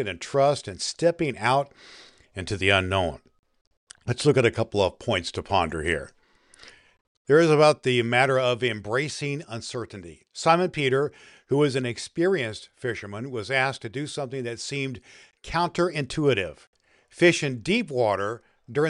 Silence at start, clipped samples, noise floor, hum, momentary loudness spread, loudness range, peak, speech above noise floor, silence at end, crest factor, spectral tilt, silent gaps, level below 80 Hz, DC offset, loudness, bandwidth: 0 s; under 0.1%; -55 dBFS; none; 13 LU; 5 LU; -4 dBFS; 30 dB; 0 s; 22 dB; -5 dB/octave; 3.39-3.43 s, 3.61-3.71 s, 3.77-3.87 s, 7.01-7.25 s, 16.67-16.73 s; -54 dBFS; under 0.1%; -24 LUFS; 11.5 kHz